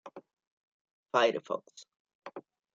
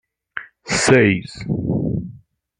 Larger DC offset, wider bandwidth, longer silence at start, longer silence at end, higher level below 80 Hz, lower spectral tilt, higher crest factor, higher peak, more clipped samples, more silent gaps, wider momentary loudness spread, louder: neither; second, 7.8 kHz vs 11 kHz; second, 0.05 s vs 0.35 s; about the same, 0.35 s vs 0.4 s; second, -86 dBFS vs -44 dBFS; second, -3.5 dB/octave vs -5 dB/octave; first, 24 dB vs 18 dB; second, -12 dBFS vs -2 dBFS; neither; first, 0.47-0.85 s, 0.91-1.03 s, 2.00-2.05 s, 2.15-2.22 s vs none; first, 24 LU vs 20 LU; second, -31 LUFS vs -18 LUFS